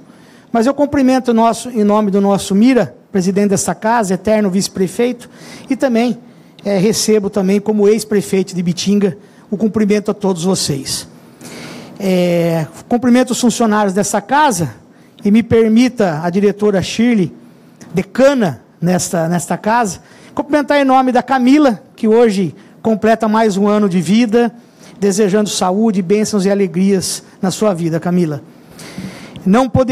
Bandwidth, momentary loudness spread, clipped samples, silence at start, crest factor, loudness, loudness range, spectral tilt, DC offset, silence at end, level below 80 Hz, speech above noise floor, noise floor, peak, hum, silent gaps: 15.5 kHz; 10 LU; under 0.1%; 0.55 s; 12 dB; -14 LUFS; 3 LU; -5.5 dB/octave; under 0.1%; 0 s; -50 dBFS; 29 dB; -42 dBFS; -2 dBFS; none; none